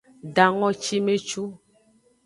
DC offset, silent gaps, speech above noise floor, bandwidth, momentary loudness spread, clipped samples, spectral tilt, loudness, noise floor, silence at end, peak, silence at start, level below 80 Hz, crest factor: under 0.1%; none; 38 dB; 11.5 kHz; 12 LU; under 0.1%; -4 dB/octave; -23 LUFS; -61 dBFS; 0.7 s; -2 dBFS; 0.25 s; -68 dBFS; 24 dB